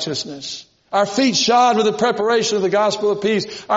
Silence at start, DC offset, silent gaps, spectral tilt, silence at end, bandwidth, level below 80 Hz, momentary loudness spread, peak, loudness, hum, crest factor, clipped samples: 0 s; under 0.1%; none; -2.5 dB/octave; 0 s; 8 kHz; -62 dBFS; 13 LU; -4 dBFS; -17 LUFS; none; 14 dB; under 0.1%